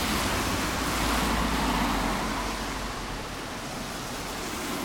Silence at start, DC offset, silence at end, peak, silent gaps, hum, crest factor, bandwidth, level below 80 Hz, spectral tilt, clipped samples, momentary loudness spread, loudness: 0 s; under 0.1%; 0 s; -12 dBFS; none; none; 16 dB; 20 kHz; -38 dBFS; -3.5 dB/octave; under 0.1%; 9 LU; -29 LUFS